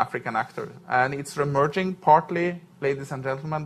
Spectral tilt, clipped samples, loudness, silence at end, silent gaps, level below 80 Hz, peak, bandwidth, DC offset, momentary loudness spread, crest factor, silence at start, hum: -6 dB/octave; under 0.1%; -25 LUFS; 0 s; none; -62 dBFS; -4 dBFS; 13.5 kHz; under 0.1%; 11 LU; 20 dB; 0 s; none